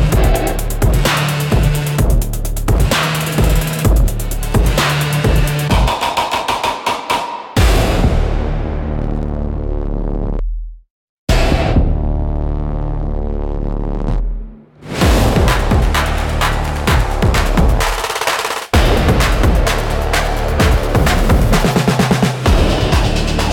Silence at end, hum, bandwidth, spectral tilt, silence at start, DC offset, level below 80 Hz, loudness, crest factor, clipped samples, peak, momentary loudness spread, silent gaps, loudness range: 0 s; none; 17.5 kHz; -5 dB/octave; 0 s; under 0.1%; -18 dBFS; -16 LUFS; 14 dB; under 0.1%; 0 dBFS; 9 LU; 10.90-11.27 s; 5 LU